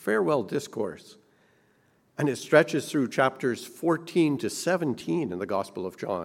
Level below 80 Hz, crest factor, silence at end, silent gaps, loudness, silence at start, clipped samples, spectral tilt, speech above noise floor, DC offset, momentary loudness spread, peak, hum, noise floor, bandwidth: -72 dBFS; 22 dB; 0 s; none; -27 LUFS; 0 s; under 0.1%; -5.5 dB/octave; 39 dB; under 0.1%; 12 LU; -4 dBFS; none; -65 dBFS; 16.5 kHz